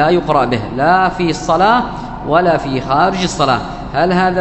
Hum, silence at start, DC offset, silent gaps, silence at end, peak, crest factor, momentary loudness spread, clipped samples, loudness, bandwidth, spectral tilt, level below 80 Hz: none; 0 s; under 0.1%; none; 0 s; 0 dBFS; 14 dB; 5 LU; under 0.1%; -14 LUFS; 8.4 kHz; -5.5 dB/octave; -34 dBFS